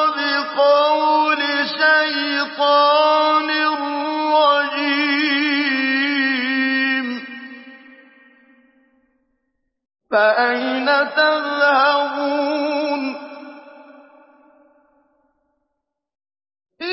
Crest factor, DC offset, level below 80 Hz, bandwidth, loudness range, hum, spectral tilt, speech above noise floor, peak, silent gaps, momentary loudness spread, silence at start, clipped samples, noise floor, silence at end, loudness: 16 dB; under 0.1%; -84 dBFS; 5.8 kHz; 10 LU; none; -5.5 dB/octave; 63 dB; -4 dBFS; none; 8 LU; 0 s; under 0.1%; -78 dBFS; 0 s; -17 LUFS